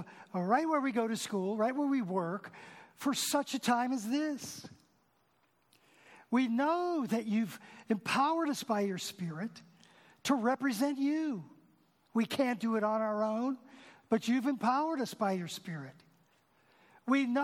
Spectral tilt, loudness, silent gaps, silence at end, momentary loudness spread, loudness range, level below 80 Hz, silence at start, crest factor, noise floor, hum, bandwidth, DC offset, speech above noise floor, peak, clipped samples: -4.5 dB/octave; -33 LUFS; none; 0 s; 13 LU; 3 LU; -84 dBFS; 0 s; 18 dB; -73 dBFS; none; 17.5 kHz; under 0.1%; 40 dB; -16 dBFS; under 0.1%